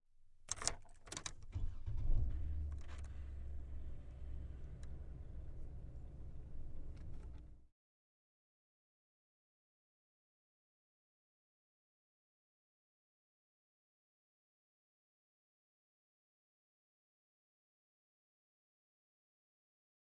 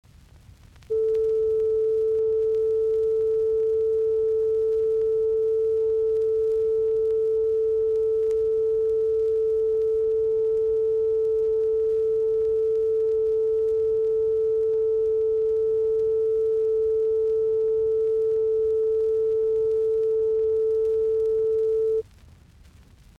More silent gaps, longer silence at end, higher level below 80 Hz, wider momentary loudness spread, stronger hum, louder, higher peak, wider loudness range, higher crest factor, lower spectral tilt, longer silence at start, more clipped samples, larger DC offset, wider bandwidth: neither; first, 12.5 s vs 1.15 s; about the same, -50 dBFS vs -52 dBFS; first, 13 LU vs 0 LU; neither; second, -49 LUFS vs -23 LUFS; first, -14 dBFS vs -18 dBFS; first, 14 LU vs 0 LU; first, 34 dB vs 6 dB; second, -3.5 dB/octave vs -7.5 dB/octave; second, 0.2 s vs 0.9 s; neither; neither; first, 10.5 kHz vs 1.9 kHz